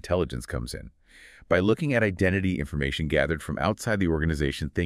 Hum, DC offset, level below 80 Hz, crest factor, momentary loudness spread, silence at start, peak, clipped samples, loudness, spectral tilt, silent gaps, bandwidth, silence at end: none; under 0.1%; -42 dBFS; 18 dB; 10 LU; 0.05 s; -8 dBFS; under 0.1%; -26 LUFS; -6 dB/octave; none; 15 kHz; 0 s